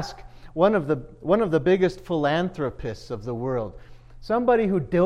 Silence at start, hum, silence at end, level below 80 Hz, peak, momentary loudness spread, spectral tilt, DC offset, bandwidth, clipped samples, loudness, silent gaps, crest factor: 0 s; none; 0 s; -46 dBFS; -6 dBFS; 13 LU; -7.5 dB/octave; under 0.1%; 10 kHz; under 0.1%; -24 LUFS; none; 18 dB